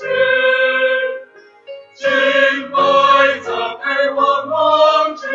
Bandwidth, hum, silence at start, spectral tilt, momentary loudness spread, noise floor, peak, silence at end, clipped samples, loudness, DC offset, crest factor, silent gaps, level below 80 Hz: 7.6 kHz; none; 0 s; -3 dB/octave; 9 LU; -41 dBFS; 0 dBFS; 0 s; under 0.1%; -14 LUFS; under 0.1%; 14 dB; none; -66 dBFS